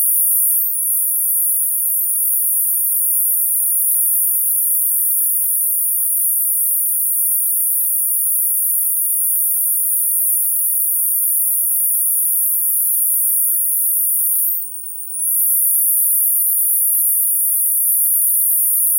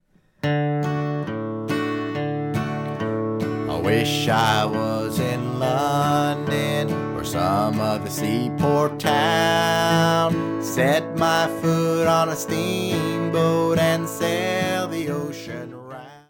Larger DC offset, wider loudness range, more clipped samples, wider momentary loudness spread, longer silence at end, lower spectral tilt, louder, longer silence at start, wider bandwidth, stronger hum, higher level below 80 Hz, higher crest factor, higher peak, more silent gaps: neither; second, 1 LU vs 4 LU; neither; second, 2 LU vs 8 LU; about the same, 0 s vs 0.1 s; second, 8.5 dB/octave vs -5.5 dB/octave; first, -13 LUFS vs -22 LUFS; second, 0 s vs 0.45 s; about the same, 16.5 kHz vs 17.5 kHz; neither; second, under -90 dBFS vs -54 dBFS; about the same, 12 dB vs 16 dB; about the same, -4 dBFS vs -4 dBFS; neither